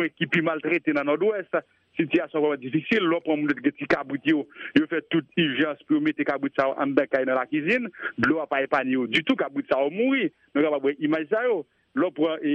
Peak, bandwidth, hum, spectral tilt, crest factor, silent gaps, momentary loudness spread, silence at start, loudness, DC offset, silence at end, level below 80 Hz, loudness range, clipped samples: -4 dBFS; 8.2 kHz; none; -7 dB/octave; 20 dB; none; 4 LU; 0 s; -25 LUFS; under 0.1%; 0 s; -66 dBFS; 1 LU; under 0.1%